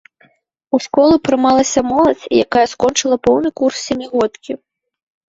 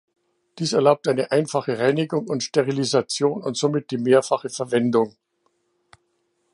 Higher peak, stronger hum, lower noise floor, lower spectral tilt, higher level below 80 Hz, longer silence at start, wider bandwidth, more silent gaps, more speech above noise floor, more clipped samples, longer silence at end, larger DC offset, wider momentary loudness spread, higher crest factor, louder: about the same, -2 dBFS vs -4 dBFS; neither; second, -56 dBFS vs -70 dBFS; second, -3.5 dB/octave vs -5 dB/octave; first, -48 dBFS vs -72 dBFS; first, 0.75 s vs 0.55 s; second, 8 kHz vs 11.5 kHz; neither; second, 42 dB vs 49 dB; neither; second, 0.75 s vs 1.45 s; neither; about the same, 8 LU vs 6 LU; about the same, 14 dB vs 18 dB; first, -15 LUFS vs -22 LUFS